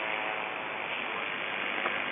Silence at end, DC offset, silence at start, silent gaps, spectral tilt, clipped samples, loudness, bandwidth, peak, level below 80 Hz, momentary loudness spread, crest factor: 0 s; under 0.1%; 0 s; none; 3 dB/octave; under 0.1%; -32 LUFS; 3.8 kHz; -14 dBFS; -76 dBFS; 3 LU; 20 dB